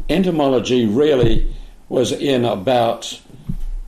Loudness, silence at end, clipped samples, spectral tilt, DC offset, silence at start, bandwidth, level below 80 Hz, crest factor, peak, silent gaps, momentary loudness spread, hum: -17 LUFS; 0 s; under 0.1%; -6 dB/octave; under 0.1%; 0 s; 14 kHz; -26 dBFS; 12 dB; -4 dBFS; none; 16 LU; none